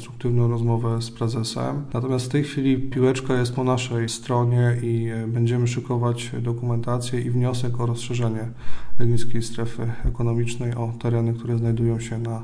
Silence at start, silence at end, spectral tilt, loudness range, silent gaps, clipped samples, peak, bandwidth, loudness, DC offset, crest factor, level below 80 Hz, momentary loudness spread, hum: 0 s; 0 s; -6.5 dB/octave; 4 LU; none; under 0.1%; -6 dBFS; 10.5 kHz; -24 LUFS; under 0.1%; 14 dB; -40 dBFS; 6 LU; none